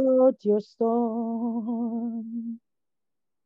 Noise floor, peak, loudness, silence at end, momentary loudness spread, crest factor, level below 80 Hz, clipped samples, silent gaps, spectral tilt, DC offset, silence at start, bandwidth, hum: under -90 dBFS; -10 dBFS; -26 LUFS; 0.9 s; 14 LU; 16 dB; -84 dBFS; under 0.1%; none; -10.5 dB/octave; under 0.1%; 0 s; 5.6 kHz; none